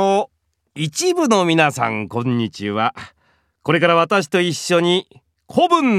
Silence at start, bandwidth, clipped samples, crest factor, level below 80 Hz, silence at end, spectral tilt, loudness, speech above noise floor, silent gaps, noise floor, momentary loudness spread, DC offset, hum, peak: 0 s; 15 kHz; under 0.1%; 18 dB; -64 dBFS; 0 s; -4.5 dB/octave; -18 LUFS; 45 dB; none; -62 dBFS; 9 LU; under 0.1%; none; 0 dBFS